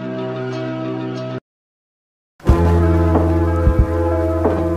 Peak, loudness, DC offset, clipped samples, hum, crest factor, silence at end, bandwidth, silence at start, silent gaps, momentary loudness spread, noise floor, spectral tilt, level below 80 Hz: -2 dBFS; -18 LUFS; under 0.1%; under 0.1%; none; 16 dB; 0 s; 7.2 kHz; 0 s; 1.41-2.39 s; 10 LU; under -90 dBFS; -9 dB/octave; -24 dBFS